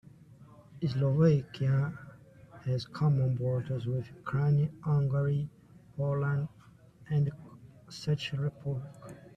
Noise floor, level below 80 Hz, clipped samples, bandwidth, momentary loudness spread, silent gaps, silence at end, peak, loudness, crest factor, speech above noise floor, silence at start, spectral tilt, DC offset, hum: -57 dBFS; -62 dBFS; under 0.1%; 7.6 kHz; 14 LU; none; 0.15 s; -14 dBFS; -31 LUFS; 18 dB; 27 dB; 0.3 s; -8.5 dB/octave; under 0.1%; none